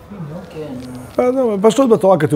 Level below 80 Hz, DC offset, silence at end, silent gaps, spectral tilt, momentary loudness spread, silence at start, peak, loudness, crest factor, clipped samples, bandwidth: -50 dBFS; under 0.1%; 0 s; none; -6.5 dB/octave; 18 LU; 0.1 s; 0 dBFS; -14 LUFS; 16 dB; under 0.1%; 16 kHz